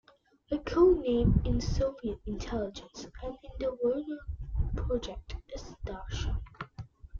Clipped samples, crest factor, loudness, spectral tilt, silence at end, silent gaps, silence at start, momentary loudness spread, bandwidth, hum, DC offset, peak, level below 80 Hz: under 0.1%; 20 dB; -32 LUFS; -7.5 dB/octave; 0 s; none; 0.5 s; 19 LU; 7.4 kHz; none; under 0.1%; -12 dBFS; -38 dBFS